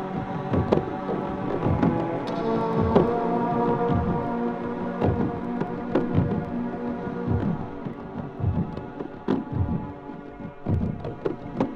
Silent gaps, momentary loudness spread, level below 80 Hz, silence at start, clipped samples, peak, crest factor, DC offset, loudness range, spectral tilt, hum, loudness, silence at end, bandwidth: none; 11 LU; -42 dBFS; 0 s; under 0.1%; -4 dBFS; 22 dB; under 0.1%; 6 LU; -9.5 dB/octave; none; -27 LUFS; 0 s; 7 kHz